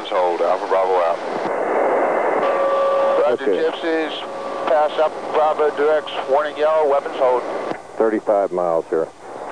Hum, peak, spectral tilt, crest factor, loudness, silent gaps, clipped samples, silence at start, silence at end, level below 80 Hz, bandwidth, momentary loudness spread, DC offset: none; -6 dBFS; -4.5 dB/octave; 12 dB; -19 LUFS; none; under 0.1%; 0 s; 0 s; -68 dBFS; 10.5 kHz; 6 LU; 0.4%